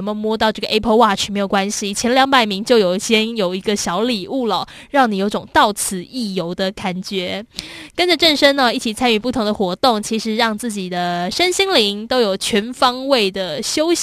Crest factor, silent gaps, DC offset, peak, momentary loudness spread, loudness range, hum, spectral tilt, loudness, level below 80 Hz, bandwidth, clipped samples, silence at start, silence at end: 18 dB; none; under 0.1%; 0 dBFS; 9 LU; 3 LU; none; -3.5 dB/octave; -17 LUFS; -48 dBFS; 14 kHz; under 0.1%; 0 s; 0 s